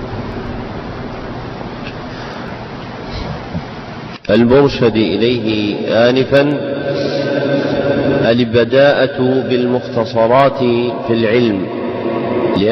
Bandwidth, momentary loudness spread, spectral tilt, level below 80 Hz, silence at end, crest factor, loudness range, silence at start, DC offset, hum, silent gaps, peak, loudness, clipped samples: 6.4 kHz; 15 LU; -7.5 dB/octave; -38 dBFS; 0 s; 12 dB; 13 LU; 0 s; under 0.1%; none; none; -2 dBFS; -14 LUFS; under 0.1%